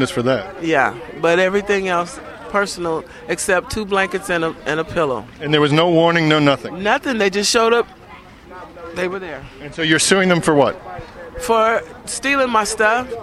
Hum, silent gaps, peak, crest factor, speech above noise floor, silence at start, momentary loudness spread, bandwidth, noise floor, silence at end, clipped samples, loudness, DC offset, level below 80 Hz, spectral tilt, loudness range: none; none; 0 dBFS; 18 dB; 23 dB; 0 s; 14 LU; 15 kHz; -40 dBFS; 0 s; under 0.1%; -17 LUFS; under 0.1%; -46 dBFS; -4 dB/octave; 4 LU